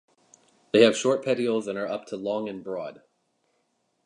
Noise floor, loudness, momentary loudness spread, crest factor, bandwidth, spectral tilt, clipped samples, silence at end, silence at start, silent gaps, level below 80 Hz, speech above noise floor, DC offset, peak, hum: -73 dBFS; -25 LUFS; 15 LU; 24 dB; 11 kHz; -4.5 dB/octave; under 0.1%; 1.1 s; 0.75 s; none; -74 dBFS; 48 dB; under 0.1%; -4 dBFS; none